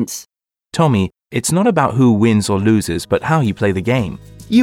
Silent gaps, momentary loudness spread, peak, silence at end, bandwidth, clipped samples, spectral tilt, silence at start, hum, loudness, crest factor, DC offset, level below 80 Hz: none; 11 LU; 0 dBFS; 0 s; 16.5 kHz; under 0.1%; -6 dB/octave; 0 s; none; -16 LUFS; 14 dB; under 0.1%; -44 dBFS